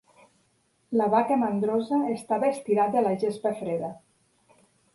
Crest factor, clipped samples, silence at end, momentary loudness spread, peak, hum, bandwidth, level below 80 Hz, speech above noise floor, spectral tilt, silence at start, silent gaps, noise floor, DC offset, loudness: 18 dB; under 0.1%; 0.95 s; 8 LU; -10 dBFS; none; 11.5 kHz; -72 dBFS; 43 dB; -7 dB/octave; 0.9 s; none; -68 dBFS; under 0.1%; -26 LUFS